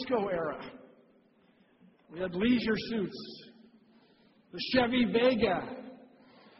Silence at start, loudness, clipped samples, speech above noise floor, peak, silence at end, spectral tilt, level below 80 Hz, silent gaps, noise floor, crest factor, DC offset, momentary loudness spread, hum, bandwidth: 0 s; -30 LUFS; under 0.1%; 35 dB; -12 dBFS; 0.65 s; -3.5 dB/octave; -60 dBFS; none; -65 dBFS; 22 dB; under 0.1%; 21 LU; none; 6 kHz